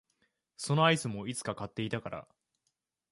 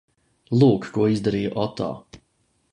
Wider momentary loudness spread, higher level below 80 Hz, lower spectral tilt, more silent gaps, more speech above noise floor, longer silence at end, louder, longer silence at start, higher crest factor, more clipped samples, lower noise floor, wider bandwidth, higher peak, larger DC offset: first, 16 LU vs 12 LU; second, -66 dBFS vs -54 dBFS; second, -4.5 dB/octave vs -8 dB/octave; neither; first, 51 dB vs 47 dB; first, 0.9 s vs 0.55 s; second, -32 LUFS vs -22 LUFS; about the same, 0.6 s vs 0.5 s; about the same, 22 dB vs 20 dB; neither; first, -83 dBFS vs -68 dBFS; first, 11.5 kHz vs 10 kHz; second, -12 dBFS vs -4 dBFS; neither